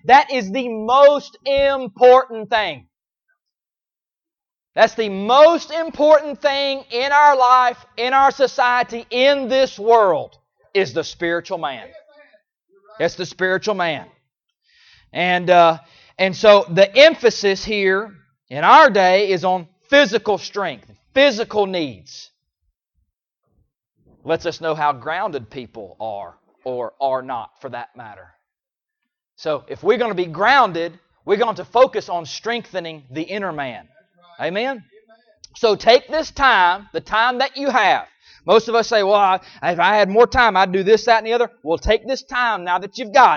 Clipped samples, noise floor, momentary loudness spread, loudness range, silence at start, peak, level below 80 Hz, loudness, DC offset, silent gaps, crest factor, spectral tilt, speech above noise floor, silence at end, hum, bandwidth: under 0.1%; under -90 dBFS; 17 LU; 11 LU; 0.05 s; 0 dBFS; -48 dBFS; -17 LUFS; under 0.1%; none; 18 dB; -4 dB/octave; over 73 dB; 0 s; none; 7.2 kHz